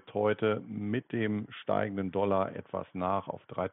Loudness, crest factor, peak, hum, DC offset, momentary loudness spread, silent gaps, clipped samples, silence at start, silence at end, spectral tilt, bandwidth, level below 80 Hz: -32 LUFS; 16 dB; -16 dBFS; none; under 0.1%; 7 LU; none; under 0.1%; 0.05 s; 0 s; -6 dB/octave; 4 kHz; -70 dBFS